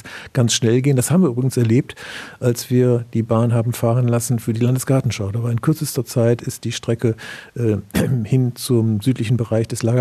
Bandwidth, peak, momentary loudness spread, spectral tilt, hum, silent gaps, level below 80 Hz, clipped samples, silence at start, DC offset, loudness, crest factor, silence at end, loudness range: 14.5 kHz; -2 dBFS; 6 LU; -6 dB/octave; none; none; -52 dBFS; under 0.1%; 0.05 s; under 0.1%; -19 LUFS; 16 dB; 0 s; 3 LU